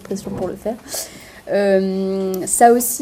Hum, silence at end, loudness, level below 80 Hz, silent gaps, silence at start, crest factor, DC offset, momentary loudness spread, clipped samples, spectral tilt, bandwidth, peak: none; 0 s; -18 LUFS; -52 dBFS; none; 0 s; 18 dB; under 0.1%; 15 LU; under 0.1%; -4 dB/octave; 16 kHz; 0 dBFS